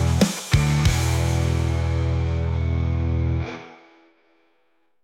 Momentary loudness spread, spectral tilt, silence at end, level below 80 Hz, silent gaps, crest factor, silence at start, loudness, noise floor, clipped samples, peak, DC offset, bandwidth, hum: 5 LU; -5.5 dB/octave; 1.3 s; -32 dBFS; none; 16 dB; 0 s; -22 LUFS; -69 dBFS; under 0.1%; -6 dBFS; under 0.1%; 16 kHz; none